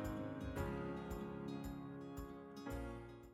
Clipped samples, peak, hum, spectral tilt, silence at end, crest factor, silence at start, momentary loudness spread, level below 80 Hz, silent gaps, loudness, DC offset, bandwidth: under 0.1%; -30 dBFS; none; -7 dB/octave; 0 s; 16 dB; 0 s; 7 LU; -56 dBFS; none; -48 LUFS; under 0.1%; 19 kHz